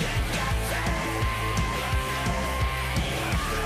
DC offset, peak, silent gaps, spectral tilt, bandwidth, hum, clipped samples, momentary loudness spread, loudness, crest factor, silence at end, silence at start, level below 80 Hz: under 0.1%; -16 dBFS; none; -4.5 dB/octave; 15.5 kHz; none; under 0.1%; 1 LU; -27 LUFS; 12 dB; 0 s; 0 s; -32 dBFS